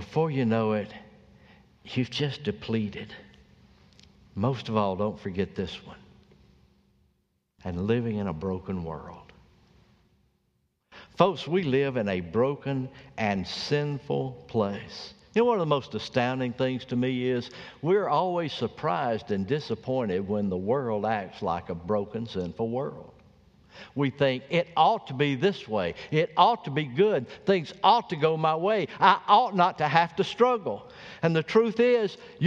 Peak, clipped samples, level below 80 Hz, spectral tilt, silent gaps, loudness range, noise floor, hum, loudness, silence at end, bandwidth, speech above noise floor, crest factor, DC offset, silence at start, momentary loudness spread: -4 dBFS; under 0.1%; -60 dBFS; -7 dB/octave; none; 10 LU; -73 dBFS; none; -27 LUFS; 0 s; 8 kHz; 47 dB; 24 dB; under 0.1%; 0 s; 12 LU